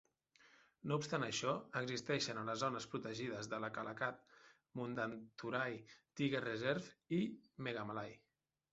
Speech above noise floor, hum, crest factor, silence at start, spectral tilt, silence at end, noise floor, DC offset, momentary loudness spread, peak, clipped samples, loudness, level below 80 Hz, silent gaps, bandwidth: 28 dB; none; 20 dB; 0.45 s; -4 dB/octave; 0.55 s; -71 dBFS; under 0.1%; 9 LU; -22 dBFS; under 0.1%; -42 LUFS; -80 dBFS; none; 8 kHz